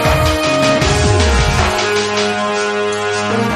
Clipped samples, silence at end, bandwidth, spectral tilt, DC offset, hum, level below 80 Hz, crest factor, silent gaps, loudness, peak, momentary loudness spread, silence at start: under 0.1%; 0 s; 14 kHz; -4.5 dB/octave; under 0.1%; none; -24 dBFS; 14 dB; none; -14 LUFS; 0 dBFS; 4 LU; 0 s